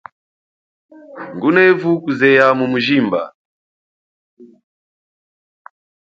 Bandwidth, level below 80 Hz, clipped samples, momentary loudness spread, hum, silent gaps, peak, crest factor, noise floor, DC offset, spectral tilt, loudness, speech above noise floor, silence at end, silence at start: 7.4 kHz; -64 dBFS; under 0.1%; 17 LU; none; 3.35-4.37 s; 0 dBFS; 18 dB; under -90 dBFS; under 0.1%; -7 dB/octave; -14 LUFS; over 76 dB; 1.65 s; 1.1 s